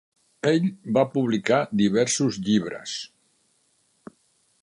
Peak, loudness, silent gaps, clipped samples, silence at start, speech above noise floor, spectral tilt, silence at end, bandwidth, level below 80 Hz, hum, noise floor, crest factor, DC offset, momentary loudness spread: -6 dBFS; -23 LUFS; none; under 0.1%; 0.45 s; 44 dB; -5 dB/octave; 1.55 s; 11 kHz; -64 dBFS; none; -67 dBFS; 18 dB; under 0.1%; 11 LU